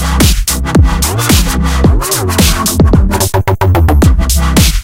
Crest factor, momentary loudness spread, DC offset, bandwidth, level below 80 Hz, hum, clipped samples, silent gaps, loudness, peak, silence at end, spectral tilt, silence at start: 8 dB; 3 LU; under 0.1%; 17 kHz; -12 dBFS; none; 0.1%; none; -10 LUFS; 0 dBFS; 0 s; -4.5 dB/octave; 0 s